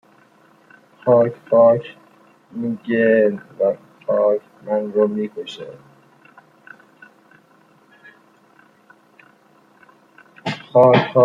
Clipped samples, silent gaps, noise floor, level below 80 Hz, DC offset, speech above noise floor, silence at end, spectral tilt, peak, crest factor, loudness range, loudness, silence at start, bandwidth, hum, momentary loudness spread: under 0.1%; none; -54 dBFS; -68 dBFS; under 0.1%; 37 dB; 0 s; -8 dB/octave; -2 dBFS; 18 dB; 15 LU; -18 LUFS; 1.05 s; 7.4 kHz; none; 18 LU